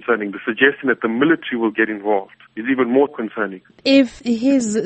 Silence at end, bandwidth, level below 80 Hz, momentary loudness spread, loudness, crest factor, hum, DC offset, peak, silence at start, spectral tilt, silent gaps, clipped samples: 0 s; 8.8 kHz; -58 dBFS; 9 LU; -18 LUFS; 18 dB; none; under 0.1%; 0 dBFS; 0.05 s; -4.5 dB/octave; none; under 0.1%